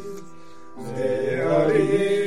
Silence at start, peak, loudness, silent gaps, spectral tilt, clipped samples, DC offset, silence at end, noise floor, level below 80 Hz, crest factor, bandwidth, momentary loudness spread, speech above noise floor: 0 s; -8 dBFS; -22 LUFS; none; -6.5 dB/octave; under 0.1%; 1%; 0 s; -46 dBFS; -66 dBFS; 14 dB; 13 kHz; 19 LU; 24 dB